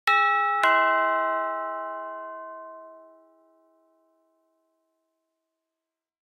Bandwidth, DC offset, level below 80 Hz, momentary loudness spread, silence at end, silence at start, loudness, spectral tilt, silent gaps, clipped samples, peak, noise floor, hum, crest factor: 15.5 kHz; under 0.1%; under -90 dBFS; 21 LU; 3.3 s; 0.05 s; -23 LUFS; -0.5 dB/octave; none; under 0.1%; -8 dBFS; -88 dBFS; none; 20 dB